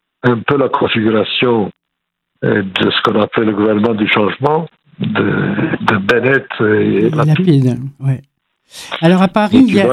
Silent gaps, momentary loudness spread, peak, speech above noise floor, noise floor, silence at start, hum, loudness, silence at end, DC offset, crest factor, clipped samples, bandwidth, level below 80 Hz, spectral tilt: none; 9 LU; 0 dBFS; 62 dB; -75 dBFS; 0.25 s; none; -13 LUFS; 0 s; under 0.1%; 14 dB; under 0.1%; 12 kHz; -52 dBFS; -7 dB/octave